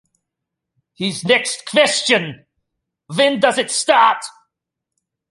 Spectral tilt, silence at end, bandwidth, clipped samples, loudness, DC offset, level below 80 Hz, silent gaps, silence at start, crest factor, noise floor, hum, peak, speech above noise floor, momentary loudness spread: -2.5 dB/octave; 1 s; 11.5 kHz; under 0.1%; -16 LUFS; under 0.1%; -68 dBFS; none; 1 s; 18 dB; -81 dBFS; none; 0 dBFS; 65 dB; 12 LU